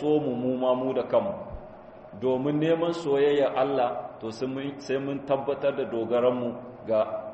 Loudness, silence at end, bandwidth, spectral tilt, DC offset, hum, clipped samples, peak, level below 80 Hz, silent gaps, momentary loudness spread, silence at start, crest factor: -27 LUFS; 0 s; 8.2 kHz; -7 dB/octave; under 0.1%; none; under 0.1%; -10 dBFS; -58 dBFS; none; 13 LU; 0 s; 16 dB